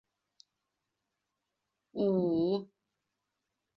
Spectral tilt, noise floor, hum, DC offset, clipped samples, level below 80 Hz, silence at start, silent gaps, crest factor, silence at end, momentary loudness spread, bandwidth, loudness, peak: -10 dB/octave; -86 dBFS; none; under 0.1%; under 0.1%; -74 dBFS; 1.95 s; none; 18 dB; 1.15 s; 8 LU; 6 kHz; -31 LUFS; -20 dBFS